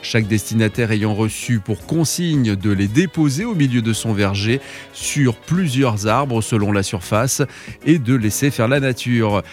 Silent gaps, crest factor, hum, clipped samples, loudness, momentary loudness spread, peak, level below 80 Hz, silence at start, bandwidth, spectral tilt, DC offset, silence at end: none; 16 dB; none; under 0.1%; -18 LUFS; 4 LU; -2 dBFS; -48 dBFS; 0 s; 16.5 kHz; -5.5 dB/octave; under 0.1%; 0 s